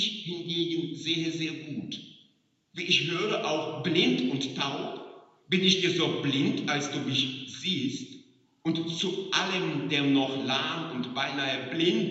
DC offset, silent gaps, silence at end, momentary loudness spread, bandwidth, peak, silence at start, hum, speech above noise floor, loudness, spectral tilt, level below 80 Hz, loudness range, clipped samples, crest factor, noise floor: under 0.1%; none; 0 s; 12 LU; 8 kHz; -8 dBFS; 0 s; none; 40 dB; -28 LUFS; -4 dB/octave; -76 dBFS; 3 LU; under 0.1%; 20 dB; -68 dBFS